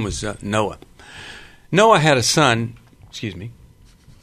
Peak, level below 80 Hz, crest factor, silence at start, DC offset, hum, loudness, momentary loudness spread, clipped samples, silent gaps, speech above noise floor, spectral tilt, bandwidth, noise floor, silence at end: 0 dBFS; -44 dBFS; 20 dB; 0 s; under 0.1%; none; -17 LUFS; 24 LU; under 0.1%; none; 30 dB; -4 dB/octave; 13.5 kHz; -48 dBFS; 0.7 s